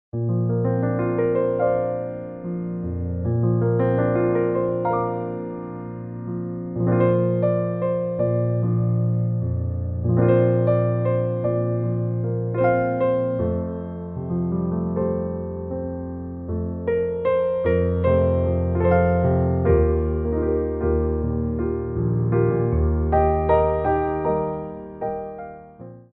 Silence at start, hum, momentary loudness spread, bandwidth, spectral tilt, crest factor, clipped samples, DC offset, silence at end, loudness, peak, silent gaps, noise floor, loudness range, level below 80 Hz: 0.15 s; none; 12 LU; 3.8 kHz; -10 dB/octave; 16 dB; under 0.1%; under 0.1%; 0.15 s; -22 LUFS; -6 dBFS; none; -42 dBFS; 4 LU; -34 dBFS